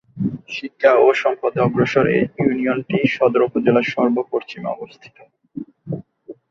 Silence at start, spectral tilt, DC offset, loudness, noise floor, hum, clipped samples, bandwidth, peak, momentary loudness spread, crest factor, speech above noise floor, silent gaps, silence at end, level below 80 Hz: 0.15 s; -7.5 dB/octave; under 0.1%; -18 LUFS; -41 dBFS; none; under 0.1%; 7.2 kHz; -2 dBFS; 16 LU; 18 dB; 23 dB; none; 0.2 s; -58 dBFS